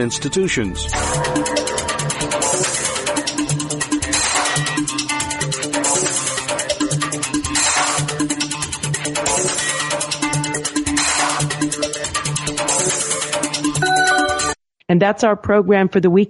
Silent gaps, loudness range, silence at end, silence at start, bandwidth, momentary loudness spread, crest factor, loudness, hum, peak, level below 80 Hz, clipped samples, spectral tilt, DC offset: none; 2 LU; 0 s; 0 s; 11.5 kHz; 6 LU; 16 dB; -18 LUFS; none; -2 dBFS; -40 dBFS; under 0.1%; -3 dB/octave; under 0.1%